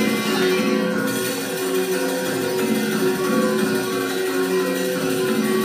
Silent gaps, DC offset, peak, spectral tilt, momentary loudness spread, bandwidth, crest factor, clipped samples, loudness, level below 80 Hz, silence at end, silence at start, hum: none; under 0.1%; -6 dBFS; -4 dB/octave; 3 LU; 15.5 kHz; 14 dB; under 0.1%; -21 LUFS; -62 dBFS; 0 s; 0 s; none